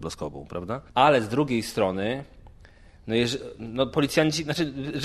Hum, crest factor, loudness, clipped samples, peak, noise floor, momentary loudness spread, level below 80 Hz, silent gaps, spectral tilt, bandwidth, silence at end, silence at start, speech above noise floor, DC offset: none; 22 dB; -25 LUFS; under 0.1%; -4 dBFS; -51 dBFS; 14 LU; -52 dBFS; none; -5 dB/octave; 14.5 kHz; 0 s; 0 s; 25 dB; under 0.1%